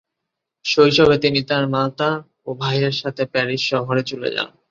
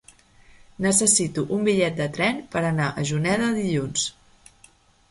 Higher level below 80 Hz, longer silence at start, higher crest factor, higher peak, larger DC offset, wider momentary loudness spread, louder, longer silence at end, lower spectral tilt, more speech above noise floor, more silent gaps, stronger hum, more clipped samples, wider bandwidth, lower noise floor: about the same, -52 dBFS vs -54 dBFS; second, 0.65 s vs 0.8 s; about the same, 18 dB vs 20 dB; first, -2 dBFS vs -6 dBFS; neither; first, 11 LU vs 8 LU; first, -19 LUFS vs -22 LUFS; second, 0.25 s vs 1 s; first, -5.5 dB/octave vs -4 dB/octave; first, 62 dB vs 33 dB; neither; neither; neither; second, 7.6 kHz vs 12 kHz; first, -81 dBFS vs -56 dBFS